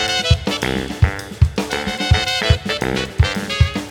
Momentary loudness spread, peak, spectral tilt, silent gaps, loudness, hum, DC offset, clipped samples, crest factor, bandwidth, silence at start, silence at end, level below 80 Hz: 5 LU; 0 dBFS; -4.5 dB/octave; none; -18 LUFS; none; under 0.1%; under 0.1%; 18 dB; 17 kHz; 0 s; 0 s; -24 dBFS